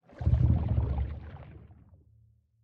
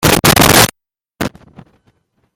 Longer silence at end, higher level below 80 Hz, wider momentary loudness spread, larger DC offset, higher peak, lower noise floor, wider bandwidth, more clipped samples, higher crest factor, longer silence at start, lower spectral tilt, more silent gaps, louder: second, 0.9 s vs 1.1 s; about the same, -34 dBFS vs -32 dBFS; first, 22 LU vs 17 LU; neither; second, -12 dBFS vs 0 dBFS; second, -63 dBFS vs -67 dBFS; second, 4 kHz vs over 20 kHz; second, under 0.1% vs 0.3%; about the same, 18 dB vs 14 dB; first, 0.2 s vs 0 s; first, -11 dB/octave vs -3 dB/octave; neither; second, -29 LUFS vs -8 LUFS